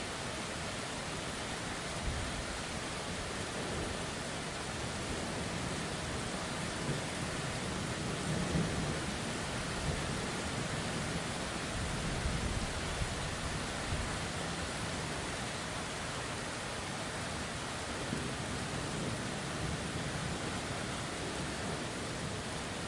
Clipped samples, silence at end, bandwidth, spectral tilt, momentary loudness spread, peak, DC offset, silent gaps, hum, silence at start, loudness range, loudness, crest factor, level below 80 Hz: under 0.1%; 0 s; 11.5 kHz; -4 dB/octave; 3 LU; -22 dBFS; under 0.1%; none; none; 0 s; 2 LU; -37 LUFS; 16 dB; -48 dBFS